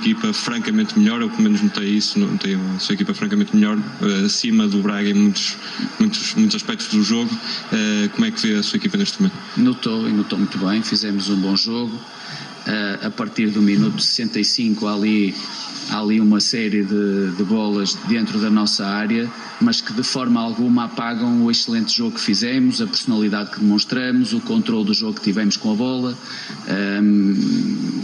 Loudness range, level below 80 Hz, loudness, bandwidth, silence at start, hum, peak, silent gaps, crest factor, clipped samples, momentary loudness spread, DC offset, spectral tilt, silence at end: 2 LU; -68 dBFS; -19 LUFS; 11 kHz; 0 s; none; -4 dBFS; none; 14 dB; under 0.1%; 6 LU; under 0.1%; -4.5 dB/octave; 0 s